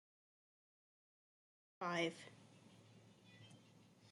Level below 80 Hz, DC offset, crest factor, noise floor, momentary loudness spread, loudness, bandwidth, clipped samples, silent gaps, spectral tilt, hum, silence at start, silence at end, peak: under -90 dBFS; under 0.1%; 26 dB; -68 dBFS; 25 LU; -44 LUFS; 11.5 kHz; under 0.1%; none; -4.5 dB/octave; none; 1.8 s; 0 s; -26 dBFS